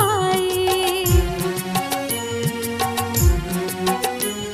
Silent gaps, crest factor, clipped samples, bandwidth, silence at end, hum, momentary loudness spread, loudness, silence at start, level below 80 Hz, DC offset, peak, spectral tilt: none; 16 dB; under 0.1%; 15.5 kHz; 0 s; none; 5 LU; -21 LUFS; 0 s; -28 dBFS; under 0.1%; -4 dBFS; -4 dB/octave